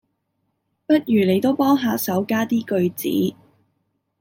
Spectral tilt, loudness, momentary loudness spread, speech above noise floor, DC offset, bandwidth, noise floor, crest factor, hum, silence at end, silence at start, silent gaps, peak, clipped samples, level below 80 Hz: -6 dB/octave; -20 LUFS; 5 LU; 54 dB; under 0.1%; 17 kHz; -73 dBFS; 16 dB; none; 0.9 s; 0.9 s; none; -6 dBFS; under 0.1%; -66 dBFS